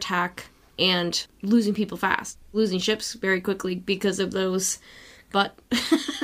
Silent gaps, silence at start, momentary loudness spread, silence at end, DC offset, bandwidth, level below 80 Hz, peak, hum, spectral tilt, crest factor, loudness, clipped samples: none; 0 s; 6 LU; 0 s; under 0.1%; 15.5 kHz; -58 dBFS; -4 dBFS; none; -3.5 dB/octave; 22 dB; -25 LUFS; under 0.1%